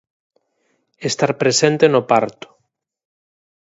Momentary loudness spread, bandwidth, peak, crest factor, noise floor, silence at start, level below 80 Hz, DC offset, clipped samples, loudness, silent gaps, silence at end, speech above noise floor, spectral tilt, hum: 12 LU; 8 kHz; 0 dBFS; 20 dB; -69 dBFS; 1 s; -64 dBFS; under 0.1%; under 0.1%; -16 LUFS; none; 1.45 s; 53 dB; -4 dB/octave; none